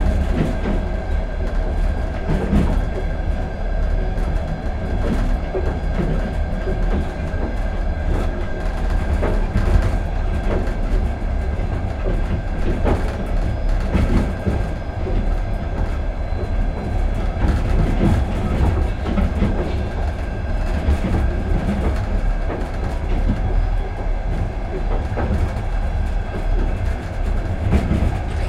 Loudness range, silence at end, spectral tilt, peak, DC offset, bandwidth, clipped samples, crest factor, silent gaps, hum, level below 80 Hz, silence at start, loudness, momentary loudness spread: 3 LU; 0 s; -8 dB/octave; -4 dBFS; under 0.1%; 9.2 kHz; under 0.1%; 16 dB; none; none; -20 dBFS; 0 s; -23 LUFS; 6 LU